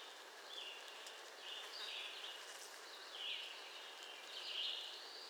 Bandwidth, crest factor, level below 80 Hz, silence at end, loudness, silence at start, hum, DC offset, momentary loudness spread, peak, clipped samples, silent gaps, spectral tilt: over 20 kHz; 18 dB; under -90 dBFS; 0 s; -48 LUFS; 0 s; none; under 0.1%; 9 LU; -32 dBFS; under 0.1%; none; 2.5 dB/octave